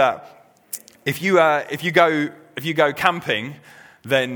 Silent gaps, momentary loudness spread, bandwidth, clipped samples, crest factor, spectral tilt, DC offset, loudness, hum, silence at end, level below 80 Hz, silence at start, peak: none; 17 LU; over 20 kHz; under 0.1%; 20 dB; -4.5 dB/octave; under 0.1%; -20 LUFS; none; 0 s; -64 dBFS; 0 s; 0 dBFS